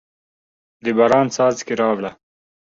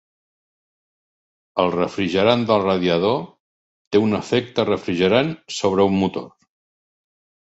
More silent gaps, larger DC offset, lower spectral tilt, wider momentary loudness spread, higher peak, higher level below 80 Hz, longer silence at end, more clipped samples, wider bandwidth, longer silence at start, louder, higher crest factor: second, none vs 3.40-3.91 s; neither; about the same, -5 dB/octave vs -6 dB/octave; first, 11 LU vs 7 LU; about the same, -2 dBFS vs -2 dBFS; second, -60 dBFS vs -52 dBFS; second, 0.7 s vs 1.1 s; neither; about the same, 7.8 kHz vs 8.2 kHz; second, 0.85 s vs 1.55 s; about the same, -18 LUFS vs -20 LUFS; about the same, 18 dB vs 18 dB